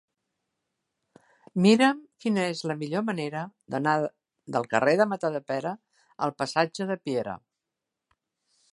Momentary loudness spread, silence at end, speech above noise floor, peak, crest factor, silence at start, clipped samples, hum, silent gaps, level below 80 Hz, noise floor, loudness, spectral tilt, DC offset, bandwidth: 13 LU; 1.35 s; 60 dB; -6 dBFS; 22 dB; 1.55 s; under 0.1%; none; none; -74 dBFS; -86 dBFS; -27 LUFS; -5.5 dB/octave; under 0.1%; 11.5 kHz